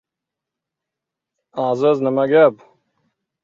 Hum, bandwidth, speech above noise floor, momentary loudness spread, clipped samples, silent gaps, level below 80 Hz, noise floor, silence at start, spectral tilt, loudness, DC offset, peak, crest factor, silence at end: none; 7.2 kHz; 69 dB; 10 LU; under 0.1%; none; -68 dBFS; -84 dBFS; 1.55 s; -7.5 dB/octave; -16 LUFS; under 0.1%; -2 dBFS; 18 dB; 0.9 s